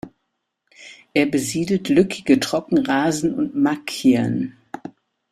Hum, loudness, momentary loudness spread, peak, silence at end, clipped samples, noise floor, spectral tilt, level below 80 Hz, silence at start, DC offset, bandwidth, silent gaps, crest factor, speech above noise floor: none; -20 LUFS; 18 LU; -2 dBFS; 0.4 s; under 0.1%; -76 dBFS; -5 dB/octave; -58 dBFS; 0.05 s; under 0.1%; 14 kHz; none; 18 dB; 57 dB